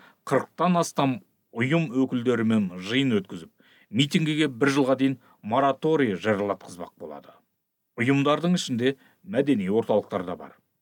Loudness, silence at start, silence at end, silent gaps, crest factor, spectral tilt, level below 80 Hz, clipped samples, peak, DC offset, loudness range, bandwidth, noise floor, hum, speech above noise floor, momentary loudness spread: -25 LUFS; 0.25 s; 0.3 s; none; 18 dB; -6 dB/octave; -74 dBFS; under 0.1%; -8 dBFS; under 0.1%; 2 LU; 17.5 kHz; -77 dBFS; none; 53 dB; 17 LU